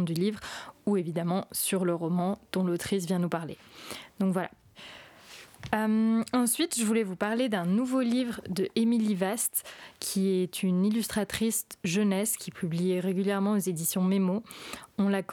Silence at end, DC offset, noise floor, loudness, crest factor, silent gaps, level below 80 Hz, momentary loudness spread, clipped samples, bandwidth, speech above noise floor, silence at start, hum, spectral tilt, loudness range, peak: 0 s; under 0.1%; -51 dBFS; -29 LUFS; 22 dB; none; -64 dBFS; 15 LU; under 0.1%; 18.5 kHz; 22 dB; 0 s; none; -5 dB/octave; 4 LU; -8 dBFS